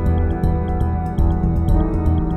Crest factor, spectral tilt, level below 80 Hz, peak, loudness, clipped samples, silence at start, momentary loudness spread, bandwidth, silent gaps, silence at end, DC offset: 12 dB; -10 dB/octave; -20 dBFS; -4 dBFS; -20 LUFS; under 0.1%; 0 s; 3 LU; 4.1 kHz; none; 0 s; under 0.1%